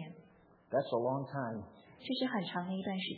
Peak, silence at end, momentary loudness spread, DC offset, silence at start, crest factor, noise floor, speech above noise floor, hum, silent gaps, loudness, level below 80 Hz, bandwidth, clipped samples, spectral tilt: -20 dBFS; 0 s; 16 LU; under 0.1%; 0 s; 18 dB; -64 dBFS; 27 dB; none; none; -37 LUFS; -78 dBFS; 4.9 kHz; under 0.1%; -4.5 dB/octave